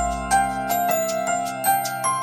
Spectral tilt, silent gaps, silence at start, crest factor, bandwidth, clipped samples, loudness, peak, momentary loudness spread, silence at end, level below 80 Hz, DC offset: -3 dB/octave; none; 0 s; 14 dB; 17 kHz; under 0.1%; -22 LUFS; -8 dBFS; 2 LU; 0 s; -42 dBFS; under 0.1%